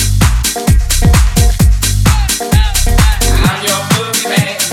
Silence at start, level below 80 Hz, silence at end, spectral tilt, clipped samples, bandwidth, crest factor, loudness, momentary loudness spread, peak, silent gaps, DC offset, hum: 0 s; -12 dBFS; 0 s; -4 dB/octave; under 0.1%; 17.5 kHz; 10 dB; -11 LUFS; 3 LU; 0 dBFS; none; under 0.1%; none